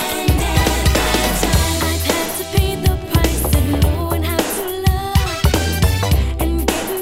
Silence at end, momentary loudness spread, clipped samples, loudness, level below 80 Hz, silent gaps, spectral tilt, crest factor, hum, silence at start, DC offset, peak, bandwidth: 0 s; 3 LU; under 0.1%; -17 LUFS; -20 dBFS; none; -4.5 dB/octave; 16 dB; none; 0 s; under 0.1%; -2 dBFS; 16.5 kHz